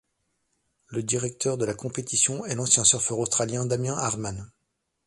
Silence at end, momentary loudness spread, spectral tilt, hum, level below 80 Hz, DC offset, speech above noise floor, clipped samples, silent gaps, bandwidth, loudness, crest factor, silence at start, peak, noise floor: 0.6 s; 14 LU; -3 dB/octave; none; -58 dBFS; under 0.1%; 52 dB; under 0.1%; none; 11.5 kHz; -24 LUFS; 24 dB; 0.9 s; -4 dBFS; -78 dBFS